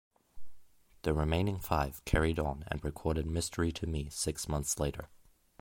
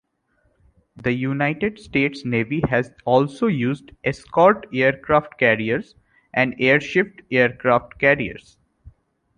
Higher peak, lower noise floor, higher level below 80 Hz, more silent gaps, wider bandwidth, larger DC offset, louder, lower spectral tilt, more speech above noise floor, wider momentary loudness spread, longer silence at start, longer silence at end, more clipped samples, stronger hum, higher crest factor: second, -12 dBFS vs -2 dBFS; second, -55 dBFS vs -66 dBFS; first, -42 dBFS vs -50 dBFS; neither; first, 16.5 kHz vs 10 kHz; neither; second, -34 LUFS vs -20 LUFS; second, -5 dB/octave vs -7 dB/octave; second, 22 dB vs 46 dB; second, 6 LU vs 9 LU; second, 0.35 s vs 1 s; about the same, 0.4 s vs 0.5 s; neither; neither; about the same, 22 dB vs 20 dB